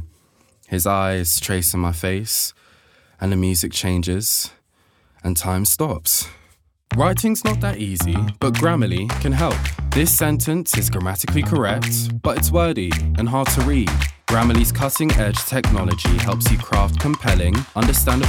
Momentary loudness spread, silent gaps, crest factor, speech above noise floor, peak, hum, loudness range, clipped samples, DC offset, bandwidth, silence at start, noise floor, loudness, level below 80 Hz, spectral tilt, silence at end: 5 LU; none; 18 dB; 41 dB; -2 dBFS; none; 2 LU; under 0.1%; under 0.1%; over 20 kHz; 0 s; -60 dBFS; -19 LUFS; -28 dBFS; -4.5 dB/octave; 0 s